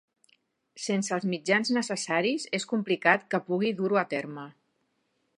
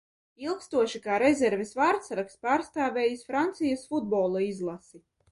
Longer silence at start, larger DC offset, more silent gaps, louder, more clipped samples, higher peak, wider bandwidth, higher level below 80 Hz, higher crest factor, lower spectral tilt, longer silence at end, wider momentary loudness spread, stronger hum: first, 0.75 s vs 0.4 s; neither; neither; about the same, -27 LUFS vs -28 LUFS; neither; first, -6 dBFS vs -10 dBFS; about the same, 11 kHz vs 11.5 kHz; second, -80 dBFS vs -68 dBFS; first, 24 dB vs 18 dB; about the same, -4 dB/octave vs -5 dB/octave; first, 0.9 s vs 0.35 s; about the same, 10 LU vs 10 LU; neither